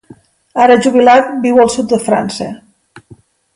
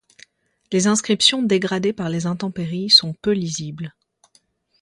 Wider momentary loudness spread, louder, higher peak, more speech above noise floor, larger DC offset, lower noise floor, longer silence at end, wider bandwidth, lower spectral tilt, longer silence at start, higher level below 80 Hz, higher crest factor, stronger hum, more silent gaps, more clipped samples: about the same, 14 LU vs 14 LU; first, -10 LUFS vs -18 LUFS; about the same, 0 dBFS vs 0 dBFS; second, 33 dB vs 41 dB; neither; second, -43 dBFS vs -61 dBFS; second, 0.4 s vs 0.95 s; about the same, 11.5 kHz vs 11.5 kHz; about the same, -4.5 dB/octave vs -3.5 dB/octave; second, 0.55 s vs 0.7 s; first, -52 dBFS vs -60 dBFS; second, 12 dB vs 22 dB; neither; neither; neither